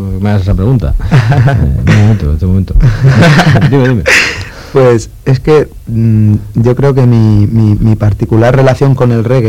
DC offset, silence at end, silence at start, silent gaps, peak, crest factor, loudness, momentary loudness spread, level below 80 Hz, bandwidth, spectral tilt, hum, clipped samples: 1%; 0 s; 0 s; none; 0 dBFS; 8 dB; -8 LUFS; 6 LU; -20 dBFS; 12.5 kHz; -7 dB/octave; none; 0.2%